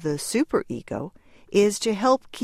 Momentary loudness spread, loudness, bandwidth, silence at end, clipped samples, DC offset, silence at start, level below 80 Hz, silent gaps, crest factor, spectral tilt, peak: 12 LU; -24 LUFS; 15.5 kHz; 0 s; under 0.1%; under 0.1%; 0 s; -56 dBFS; none; 18 dB; -4.5 dB/octave; -6 dBFS